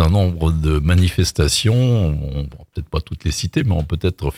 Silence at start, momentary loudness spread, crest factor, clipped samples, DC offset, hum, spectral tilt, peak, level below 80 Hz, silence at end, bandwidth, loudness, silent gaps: 0 s; 10 LU; 14 dB; under 0.1%; under 0.1%; none; -5.5 dB/octave; -2 dBFS; -26 dBFS; 0 s; 15.5 kHz; -18 LUFS; none